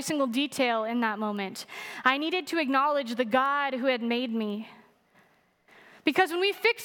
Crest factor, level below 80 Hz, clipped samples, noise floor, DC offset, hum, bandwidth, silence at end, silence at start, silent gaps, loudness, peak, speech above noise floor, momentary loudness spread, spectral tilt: 20 dB; -80 dBFS; under 0.1%; -64 dBFS; under 0.1%; none; 19 kHz; 0 s; 0 s; none; -27 LUFS; -8 dBFS; 37 dB; 10 LU; -3.5 dB/octave